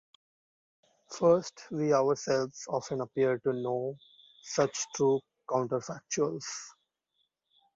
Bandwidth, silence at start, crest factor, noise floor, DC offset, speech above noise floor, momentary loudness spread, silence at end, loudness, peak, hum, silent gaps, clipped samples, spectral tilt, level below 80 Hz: 7.8 kHz; 1.1 s; 20 dB; -79 dBFS; under 0.1%; 49 dB; 13 LU; 1.05 s; -31 LUFS; -12 dBFS; none; none; under 0.1%; -4.5 dB/octave; -74 dBFS